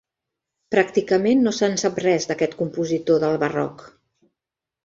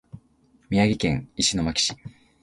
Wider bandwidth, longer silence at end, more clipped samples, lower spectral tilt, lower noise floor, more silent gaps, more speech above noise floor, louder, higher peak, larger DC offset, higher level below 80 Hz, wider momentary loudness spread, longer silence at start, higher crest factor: second, 7.8 kHz vs 11.5 kHz; first, 0.95 s vs 0.35 s; neither; about the same, -5 dB/octave vs -4 dB/octave; first, -87 dBFS vs -61 dBFS; neither; first, 66 dB vs 37 dB; about the same, -21 LUFS vs -23 LUFS; about the same, -4 dBFS vs -6 dBFS; neither; second, -62 dBFS vs -46 dBFS; about the same, 6 LU vs 5 LU; first, 0.7 s vs 0.15 s; about the same, 18 dB vs 20 dB